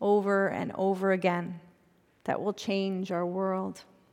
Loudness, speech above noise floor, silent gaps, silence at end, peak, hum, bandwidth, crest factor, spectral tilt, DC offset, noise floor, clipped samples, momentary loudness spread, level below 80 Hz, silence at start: -30 LUFS; 35 dB; none; 0.3 s; -12 dBFS; none; 12.5 kHz; 18 dB; -6.5 dB/octave; under 0.1%; -65 dBFS; under 0.1%; 13 LU; -76 dBFS; 0 s